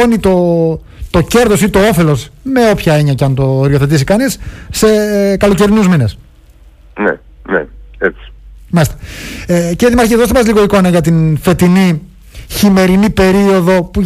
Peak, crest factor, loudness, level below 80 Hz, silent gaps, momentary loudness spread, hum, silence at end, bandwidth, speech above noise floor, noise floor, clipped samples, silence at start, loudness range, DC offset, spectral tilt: 0 dBFS; 10 dB; -10 LUFS; -28 dBFS; none; 8 LU; none; 0 s; 15.5 kHz; 30 dB; -40 dBFS; under 0.1%; 0 s; 6 LU; under 0.1%; -6 dB/octave